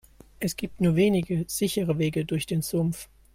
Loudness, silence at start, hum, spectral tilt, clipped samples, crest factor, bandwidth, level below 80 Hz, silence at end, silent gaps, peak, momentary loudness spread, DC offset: -26 LUFS; 0.4 s; none; -6 dB/octave; under 0.1%; 16 dB; 16.5 kHz; -52 dBFS; 0.3 s; none; -10 dBFS; 9 LU; under 0.1%